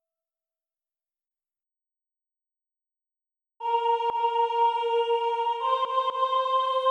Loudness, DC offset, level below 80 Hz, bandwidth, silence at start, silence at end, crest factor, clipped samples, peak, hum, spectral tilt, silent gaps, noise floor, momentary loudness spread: -25 LUFS; under 0.1%; -84 dBFS; 9 kHz; 3.6 s; 0 s; 14 dB; under 0.1%; -14 dBFS; 60 Hz at -95 dBFS; -0.5 dB/octave; none; under -90 dBFS; 3 LU